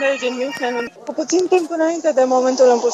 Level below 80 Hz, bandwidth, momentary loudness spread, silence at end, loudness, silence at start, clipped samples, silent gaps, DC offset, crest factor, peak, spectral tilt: -72 dBFS; 10.5 kHz; 10 LU; 0 s; -18 LUFS; 0 s; under 0.1%; none; under 0.1%; 14 dB; -2 dBFS; -2.5 dB/octave